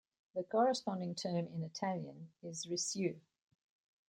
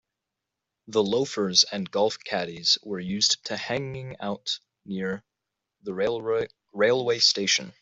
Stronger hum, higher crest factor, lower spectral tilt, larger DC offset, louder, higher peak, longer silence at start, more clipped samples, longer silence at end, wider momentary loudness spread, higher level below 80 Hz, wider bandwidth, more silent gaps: neither; about the same, 20 dB vs 24 dB; first, -4.5 dB/octave vs -2.5 dB/octave; neither; second, -39 LUFS vs -25 LUFS; second, -20 dBFS vs -4 dBFS; second, 0.35 s vs 0.9 s; neither; first, 0.9 s vs 0.1 s; about the same, 14 LU vs 14 LU; second, -84 dBFS vs -68 dBFS; first, 16 kHz vs 8.2 kHz; neither